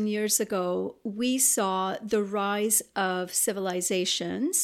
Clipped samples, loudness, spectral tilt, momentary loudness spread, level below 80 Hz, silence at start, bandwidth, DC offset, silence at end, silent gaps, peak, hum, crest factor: under 0.1%; -26 LUFS; -2.5 dB/octave; 7 LU; -72 dBFS; 0 s; 17.5 kHz; under 0.1%; 0 s; none; -10 dBFS; none; 16 dB